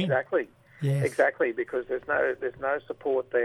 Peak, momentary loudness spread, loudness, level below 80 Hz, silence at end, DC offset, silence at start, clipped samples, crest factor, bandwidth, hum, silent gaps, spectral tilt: -10 dBFS; 7 LU; -28 LUFS; -64 dBFS; 0 s; under 0.1%; 0 s; under 0.1%; 18 dB; 12.5 kHz; none; none; -7 dB/octave